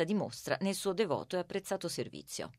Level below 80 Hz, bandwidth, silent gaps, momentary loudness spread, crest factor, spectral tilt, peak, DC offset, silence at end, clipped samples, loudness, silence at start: -72 dBFS; 16 kHz; none; 7 LU; 18 dB; -4.5 dB/octave; -18 dBFS; under 0.1%; 0.05 s; under 0.1%; -36 LUFS; 0 s